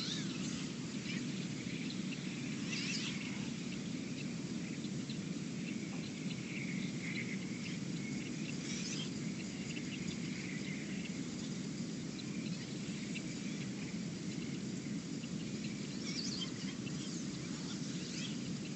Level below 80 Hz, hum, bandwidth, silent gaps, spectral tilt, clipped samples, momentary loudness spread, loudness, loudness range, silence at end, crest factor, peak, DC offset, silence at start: -68 dBFS; none; 8.6 kHz; none; -4.5 dB/octave; under 0.1%; 3 LU; -41 LUFS; 2 LU; 0 s; 14 dB; -26 dBFS; under 0.1%; 0 s